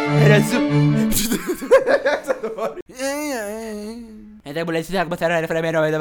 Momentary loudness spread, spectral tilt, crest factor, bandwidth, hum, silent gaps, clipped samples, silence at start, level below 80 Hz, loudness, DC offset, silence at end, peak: 16 LU; -5.5 dB/octave; 18 dB; 19.5 kHz; none; 2.82-2.86 s; under 0.1%; 0 s; -42 dBFS; -19 LUFS; under 0.1%; 0 s; 0 dBFS